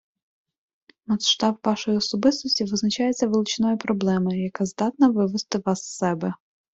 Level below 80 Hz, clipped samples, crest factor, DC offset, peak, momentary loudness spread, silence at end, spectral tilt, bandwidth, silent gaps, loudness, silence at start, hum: -62 dBFS; under 0.1%; 18 dB; under 0.1%; -6 dBFS; 7 LU; 0.4 s; -4.5 dB/octave; 8 kHz; none; -23 LUFS; 1.1 s; none